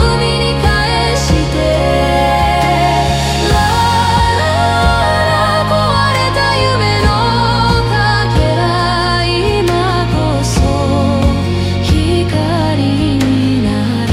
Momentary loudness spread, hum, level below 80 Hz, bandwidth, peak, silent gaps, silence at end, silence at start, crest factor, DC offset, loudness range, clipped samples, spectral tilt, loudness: 2 LU; none; -22 dBFS; 16 kHz; 0 dBFS; none; 0 s; 0 s; 12 dB; under 0.1%; 2 LU; under 0.1%; -5.5 dB/octave; -12 LUFS